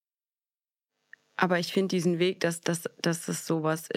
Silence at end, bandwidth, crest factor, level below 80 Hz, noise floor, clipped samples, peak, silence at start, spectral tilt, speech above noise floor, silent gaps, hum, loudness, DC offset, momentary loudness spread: 0.05 s; 16 kHz; 24 dB; -84 dBFS; under -90 dBFS; under 0.1%; -6 dBFS; 1.4 s; -5 dB/octave; over 62 dB; none; none; -28 LUFS; under 0.1%; 5 LU